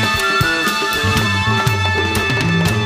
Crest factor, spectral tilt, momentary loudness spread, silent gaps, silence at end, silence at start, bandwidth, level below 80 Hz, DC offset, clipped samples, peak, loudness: 14 dB; -4 dB/octave; 2 LU; none; 0 s; 0 s; 15.5 kHz; -36 dBFS; under 0.1%; under 0.1%; -2 dBFS; -15 LUFS